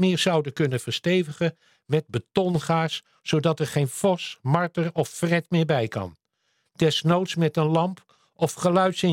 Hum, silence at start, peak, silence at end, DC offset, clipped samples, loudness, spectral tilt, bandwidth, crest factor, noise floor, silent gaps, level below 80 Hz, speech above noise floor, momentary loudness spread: none; 0 s; -4 dBFS; 0 s; under 0.1%; under 0.1%; -24 LUFS; -5.5 dB/octave; 16 kHz; 20 dB; -72 dBFS; none; -64 dBFS; 49 dB; 7 LU